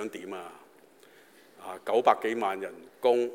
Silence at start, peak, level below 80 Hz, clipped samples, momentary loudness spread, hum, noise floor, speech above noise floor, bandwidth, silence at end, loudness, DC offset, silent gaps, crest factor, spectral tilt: 0 s; -6 dBFS; under -90 dBFS; under 0.1%; 19 LU; none; -57 dBFS; 29 dB; 16.5 kHz; 0 s; -29 LUFS; under 0.1%; none; 24 dB; -4.5 dB/octave